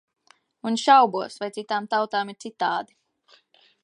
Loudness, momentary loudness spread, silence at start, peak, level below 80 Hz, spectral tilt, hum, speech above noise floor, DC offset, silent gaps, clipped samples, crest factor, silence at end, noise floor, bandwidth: -23 LUFS; 16 LU; 0.65 s; -4 dBFS; -82 dBFS; -3.5 dB/octave; none; 37 dB; under 0.1%; none; under 0.1%; 22 dB; 1 s; -60 dBFS; 11 kHz